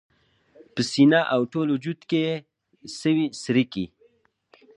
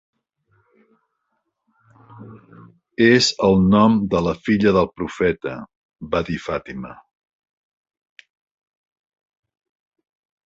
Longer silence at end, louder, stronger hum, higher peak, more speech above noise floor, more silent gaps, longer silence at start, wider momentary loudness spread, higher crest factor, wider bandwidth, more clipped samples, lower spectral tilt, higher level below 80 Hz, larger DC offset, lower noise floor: second, 0.9 s vs 3.55 s; second, -23 LUFS vs -18 LUFS; neither; about the same, -4 dBFS vs -2 dBFS; second, 41 dB vs 56 dB; second, none vs 5.76-5.89 s; second, 0.75 s vs 2.2 s; second, 16 LU vs 20 LU; about the same, 20 dB vs 20 dB; first, 10.5 kHz vs 7.8 kHz; neither; about the same, -5.5 dB/octave vs -5.5 dB/octave; second, -66 dBFS vs -46 dBFS; neither; second, -63 dBFS vs -74 dBFS